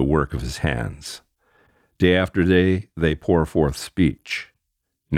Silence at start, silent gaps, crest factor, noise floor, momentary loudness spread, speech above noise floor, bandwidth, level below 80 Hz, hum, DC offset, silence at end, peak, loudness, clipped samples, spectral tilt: 0 s; none; 18 dB; -77 dBFS; 11 LU; 57 dB; 15.5 kHz; -36 dBFS; none; under 0.1%; 0 s; -4 dBFS; -21 LUFS; under 0.1%; -6.5 dB/octave